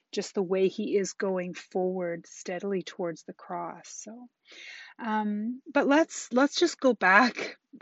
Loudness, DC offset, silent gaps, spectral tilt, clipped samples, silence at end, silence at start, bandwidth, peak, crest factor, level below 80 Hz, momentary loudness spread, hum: -28 LUFS; under 0.1%; none; -3 dB/octave; under 0.1%; 0.05 s; 0.15 s; 8 kHz; -4 dBFS; 24 dB; -80 dBFS; 19 LU; none